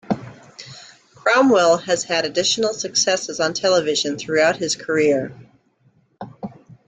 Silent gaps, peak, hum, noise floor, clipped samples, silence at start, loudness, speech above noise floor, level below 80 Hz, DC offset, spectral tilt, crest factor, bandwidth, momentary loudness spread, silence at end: none; -4 dBFS; none; -59 dBFS; under 0.1%; 0.1 s; -18 LUFS; 41 dB; -62 dBFS; under 0.1%; -2.5 dB/octave; 16 dB; 9.6 kHz; 22 LU; 0.4 s